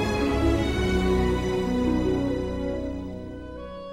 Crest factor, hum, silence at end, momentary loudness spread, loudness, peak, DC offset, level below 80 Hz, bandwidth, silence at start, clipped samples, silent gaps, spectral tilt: 16 dB; none; 0 s; 14 LU; -25 LUFS; -10 dBFS; 0.2%; -32 dBFS; 15 kHz; 0 s; under 0.1%; none; -6.5 dB/octave